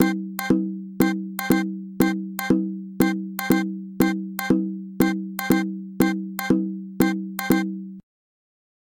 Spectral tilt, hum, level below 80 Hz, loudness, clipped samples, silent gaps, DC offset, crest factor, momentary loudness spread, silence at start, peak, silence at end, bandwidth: -6 dB/octave; none; -54 dBFS; -24 LUFS; under 0.1%; none; under 0.1%; 18 dB; 8 LU; 0 s; -4 dBFS; 1 s; 17 kHz